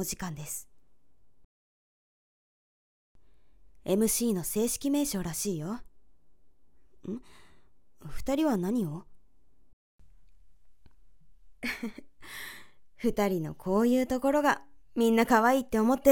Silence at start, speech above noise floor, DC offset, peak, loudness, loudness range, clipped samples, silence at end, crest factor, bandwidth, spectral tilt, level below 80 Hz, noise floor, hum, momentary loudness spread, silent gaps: 0 s; 38 dB; 0.3%; -8 dBFS; -29 LUFS; 15 LU; under 0.1%; 0 s; 22 dB; 18 kHz; -4.5 dB/octave; -54 dBFS; -66 dBFS; none; 17 LU; 1.44-3.15 s, 9.73-9.99 s